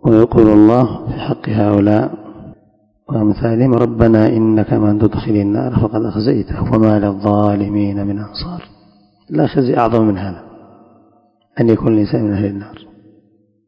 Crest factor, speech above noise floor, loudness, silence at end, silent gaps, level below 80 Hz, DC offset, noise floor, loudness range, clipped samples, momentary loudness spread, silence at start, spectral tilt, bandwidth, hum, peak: 14 dB; 41 dB; -14 LUFS; 0.9 s; none; -36 dBFS; under 0.1%; -54 dBFS; 5 LU; 0.5%; 13 LU; 0.05 s; -10.5 dB/octave; 5.4 kHz; none; 0 dBFS